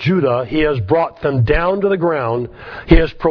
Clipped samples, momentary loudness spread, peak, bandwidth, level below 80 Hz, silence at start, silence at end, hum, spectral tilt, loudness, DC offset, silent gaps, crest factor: under 0.1%; 7 LU; 0 dBFS; 5.4 kHz; -24 dBFS; 0 s; 0 s; none; -9.5 dB/octave; -16 LUFS; under 0.1%; none; 16 dB